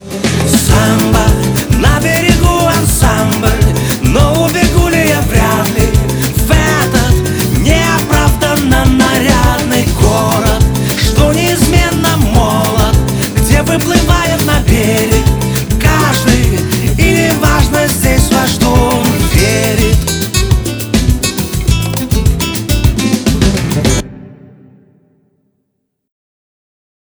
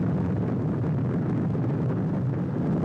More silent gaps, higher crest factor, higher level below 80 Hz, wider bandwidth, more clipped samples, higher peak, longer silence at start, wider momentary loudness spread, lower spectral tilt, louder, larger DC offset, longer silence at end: neither; about the same, 10 dB vs 10 dB; first, -16 dBFS vs -50 dBFS; first, over 20 kHz vs 5.8 kHz; neither; first, 0 dBFS vs -16 dBFS; about the same, 0 s vs 0 s; first, 4 LU vs 1 LU; second, -5 dB/octave vs -11 dB/octave; first, -10 LUFS vs -27 LUFS; neither; first, 2.7 s vs 0 s